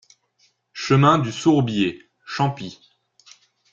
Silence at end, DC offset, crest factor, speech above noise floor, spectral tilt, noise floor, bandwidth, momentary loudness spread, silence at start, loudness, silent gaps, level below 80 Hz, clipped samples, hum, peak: 1 s; under 0.1%; 20 dB; 45 dB; -6.5 dB/octave; -64 dBFS; 7.6 kHz; 21 LU; 0.75 s; -20 LUFS; none; -58 dBFS; under 0.1%; none; -2 dBFS